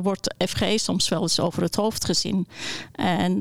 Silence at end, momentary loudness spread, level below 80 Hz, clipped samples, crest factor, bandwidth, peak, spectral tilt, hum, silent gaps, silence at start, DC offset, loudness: 0 s; 5 LU; -50 dBFS; under 0.1%; 14 dB; 16.5 kHz; -10 dBFS; -4 dB/octave; none; none; 0 s; under 0.1%; -24 LUFS